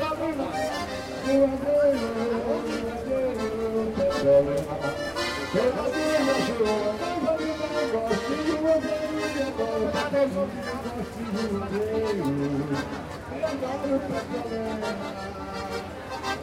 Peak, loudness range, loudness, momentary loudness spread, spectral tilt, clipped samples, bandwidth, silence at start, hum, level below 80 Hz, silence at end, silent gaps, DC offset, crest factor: -10 dBFS; 4 LU; -27 LUFS; 10 LU; -5.5 dB/octave; under 0.1%; 16 kHz; 0 s; none; -48 dBFS; 0 s; none; under 0.1%; 16 dB